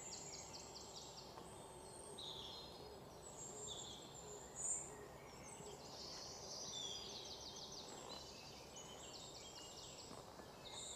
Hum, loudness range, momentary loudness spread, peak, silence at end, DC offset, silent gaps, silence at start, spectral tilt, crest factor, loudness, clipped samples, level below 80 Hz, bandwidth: none; 5 LU; 10 LU; -32 dBFS; 0 s; under 0.1%; none; 0 s; -2 dB/octave; 22 dB; -51 LUFS; under 0.1%; -72 dBFS; 15.5 kHz